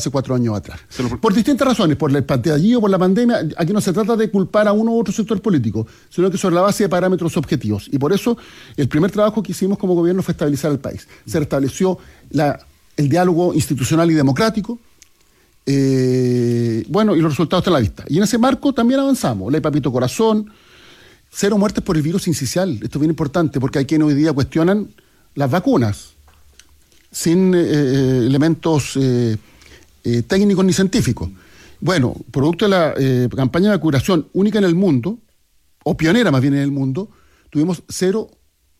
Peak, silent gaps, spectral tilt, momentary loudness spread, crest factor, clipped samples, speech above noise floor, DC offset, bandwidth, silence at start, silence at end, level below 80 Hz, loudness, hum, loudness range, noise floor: -4 dBFS; none; -6.5 dB/octave; 9 LU; 12 dB; under 0.1%; 41 dB; under 0.1%; 15.5 kHz; 0 s; 0.55 s; -46 dBFS; -17 LUFS; none; 3 LU; -57 dBFS